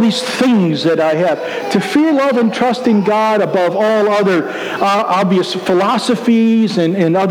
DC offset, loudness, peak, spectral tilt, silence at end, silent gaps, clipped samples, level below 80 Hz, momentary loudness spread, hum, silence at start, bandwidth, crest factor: under 0.1%; -13 LUFS; 0 dBFS; -6 dB/octave; 0 s; none; under 0.1%; -62 dBFS; 3 LU; none; 0 s; 15 kHz; 12 dB